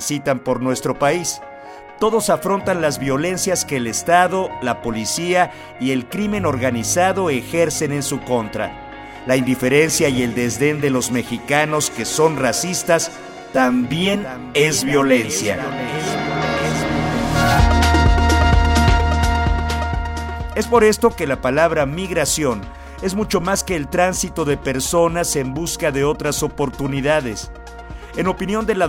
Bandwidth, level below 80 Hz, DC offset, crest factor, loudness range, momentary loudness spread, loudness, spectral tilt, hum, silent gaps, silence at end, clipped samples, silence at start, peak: 17 kHz; -28 dBFS; under 0.1%; 18 dB; 3 LU; 9 LU; -18 LUFS; -4.5 dB/octave; none; none; 0 s; under 0.1%; 0 s; 0 dBFS